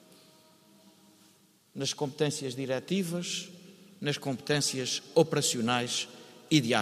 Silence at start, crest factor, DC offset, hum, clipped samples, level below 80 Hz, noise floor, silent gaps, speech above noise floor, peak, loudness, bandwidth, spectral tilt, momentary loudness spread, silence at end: 1.75 s; 22 dB; under 0.1%; none; under 0.1%; -74 dBFS; -63 dBFS; none; 33 dB; -10 dBFS; -30 LUFS; 15.5 kHz; -4 dB/octave; 10 LU; 0 s